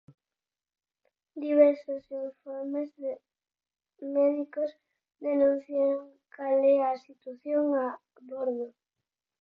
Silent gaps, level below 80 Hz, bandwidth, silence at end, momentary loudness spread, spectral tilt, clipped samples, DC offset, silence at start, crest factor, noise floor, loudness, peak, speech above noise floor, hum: none; -82 dBFS; 5.2 kHz; 0.75 s; 19 LU; -7.5 dB/octave; under 0.1%; under 0.1%; 1.35 s; 20 dB; under -90 dBFS; -29 LUFS; -10 dBFS; over 62 dB; none